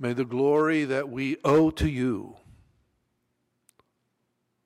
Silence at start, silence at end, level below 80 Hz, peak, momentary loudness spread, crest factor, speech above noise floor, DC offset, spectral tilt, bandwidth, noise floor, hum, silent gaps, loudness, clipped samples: 0 s; 2.35 s; -46 dBFS; -12 dBFS; 8 LU; 14 dB; 52 dB; under 0.1%; -7 dB/octave; 12.5 kHz; -76 dBFS; none; none; -25 LUFS; under 0.1%